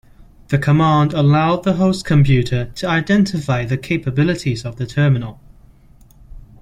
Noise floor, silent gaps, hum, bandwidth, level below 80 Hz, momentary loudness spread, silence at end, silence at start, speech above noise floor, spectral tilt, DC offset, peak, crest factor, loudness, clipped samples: -46 dBFS; none; none; 11 kHz; -40 dBFS; 8 LU; 0.2 s; 0.2 s; 31 dB; -7 dB/octave; under 0.1%; -2 dBFS; 14 dB; -17 LUFS; under 0.1%